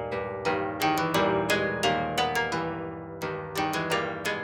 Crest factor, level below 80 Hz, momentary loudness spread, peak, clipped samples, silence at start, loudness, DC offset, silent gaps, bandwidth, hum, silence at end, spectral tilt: 18 dB; -56 dBFS; 9 LU; -10 dBFS; under 0.1%; 0 s; -28 LUFS; under 0.1%; none; over 20 kHz; none; 0 s; -4 dB/octave